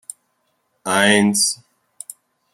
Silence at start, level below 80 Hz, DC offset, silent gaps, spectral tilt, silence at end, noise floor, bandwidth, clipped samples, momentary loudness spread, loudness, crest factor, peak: 0.85 s; -66 dBFS; under 0.1%; none; -2.5 dB/octave; 1 s; -68 dBFS; 15.5 kHz; under 0.1%; 22 LU; -16 LUFS; 20 dB; 0 dBFS